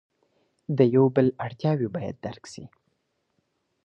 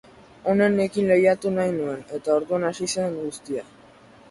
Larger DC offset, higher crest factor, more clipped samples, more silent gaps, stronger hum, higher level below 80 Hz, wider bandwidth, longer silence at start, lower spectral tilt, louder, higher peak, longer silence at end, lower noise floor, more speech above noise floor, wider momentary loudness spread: neither; about the same, 20 dB vs 18 dB; neither; neither; neither; about the same, -62 dBFS vs -62 dBFS; second, 8.8 kHz vs 11.5 kHz; first, 0.7 s vs 0.45 s; first, -8.5 dB/octave vs -5.5 dB/octave; about the same, -24 LUFS vs -23 LUFS; about the same, -6 dBFS vs -6 dBFS; first, 1.2 s vs 0.7 s; first, -75 dBFS vs -50 dBFS; first, 51 dB vs 28 dB; first, 23 LU vs 13 LU